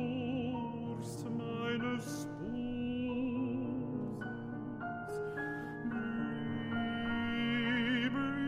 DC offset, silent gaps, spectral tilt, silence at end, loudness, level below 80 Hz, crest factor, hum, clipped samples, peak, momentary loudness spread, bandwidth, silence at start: under 0.1%; none; -6 dB/octave; 0 s; -37 LUFS; -62 dBFS; 16 dB; none; under 0.1%; -22 dBFS; 9 LU; 15 kHz; 0 s